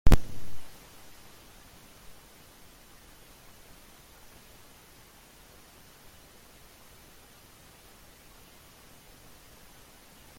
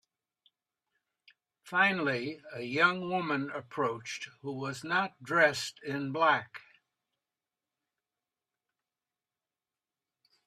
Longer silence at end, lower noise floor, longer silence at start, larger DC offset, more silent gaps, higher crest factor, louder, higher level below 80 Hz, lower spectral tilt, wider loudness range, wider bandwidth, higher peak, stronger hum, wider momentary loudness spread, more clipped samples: first, 9.7 s vs 3.85 s; second, -54 dBFS vs under -90 dBFS; second, 0.05 s vs 1.65 s; neither; neither; about the same, 24 dB vs 24 dB; second, -44 LUFS vs -31 LUFS; first, -36 dBFS vs -80 dBFS; about the same, -5.5 dB/octave vs -4.5 dB/octave; second, 1 LU vs 5 LU; first, 16.5 kHz vs 13.5 kHz; first, -6 dBFS vs -10 dBFS; neither; second, 3 LU vs 14 LU; neither